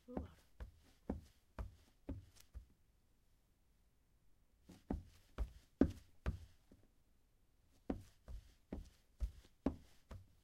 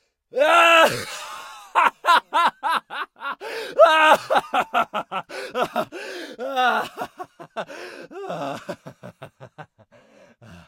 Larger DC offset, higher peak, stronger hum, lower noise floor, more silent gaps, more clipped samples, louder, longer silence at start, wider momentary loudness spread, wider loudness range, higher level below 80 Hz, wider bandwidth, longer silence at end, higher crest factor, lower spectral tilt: neither; second, -16 dBFS vs -2 dBFS; neither; first, -75 dBFS vs -54 dBFS; neither; neither; second, -48 LUFS vs -20 LUFS; second, 0.1 s vs 0.35 s; second, 18 LU vs 21 LU; second, 12 LU vs 16 LU; first, -54 dBFS vs -68 dBFS; about the same, 15.5 kHz vs 16.5 kHz; about the same, 0.2 s vs 0.1 s; first, 32 dB vs 22 dB; first, -8 dB/octave vs -2.5 dB/octave